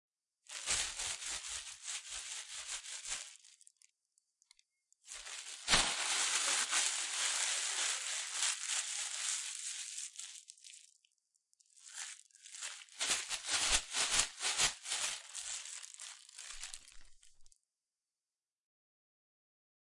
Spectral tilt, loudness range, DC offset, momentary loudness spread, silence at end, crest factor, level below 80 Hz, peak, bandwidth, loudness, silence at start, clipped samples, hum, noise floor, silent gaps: 1.5 dB/octave; 14 LU; under 0.1%; 18 LU; 2.4 s; 26 dB; -62 dBFS; -14 dBFS; 11.5 kHz; -36 LUFS; 0.5 s; under 0.1%; none; under -90 dBFS; none